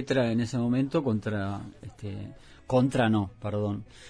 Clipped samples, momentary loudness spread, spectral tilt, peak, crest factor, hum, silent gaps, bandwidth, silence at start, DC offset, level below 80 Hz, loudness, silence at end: under 0.1%; 15 LU; -7 dB/octave; -12 dBFS; 16 dB; none; none; 10.5 kHz; 0 s; under 0.1%; -56 dBFS; -28 LUFS; 0 s